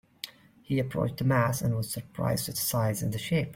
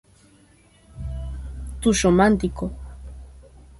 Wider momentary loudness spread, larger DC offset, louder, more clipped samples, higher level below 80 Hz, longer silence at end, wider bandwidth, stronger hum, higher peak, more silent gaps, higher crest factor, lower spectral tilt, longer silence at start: second, 9 LU vs 24 LU; neither; second, -29 LUFS vs -21 LUFS; neither; second, -56 dBFS vs -36 dBFS; second, 0 s vs 0.2 s; first, 16.5 kHz vs 11.5 kHz; neither; second, -12 dBFS vs -4 dBFS; neither; about the same, 18 dB vs 20 dB; about the same, -5 dB/octave vs -5.5 dB/octave; second, 0.25 s vs 0.95 s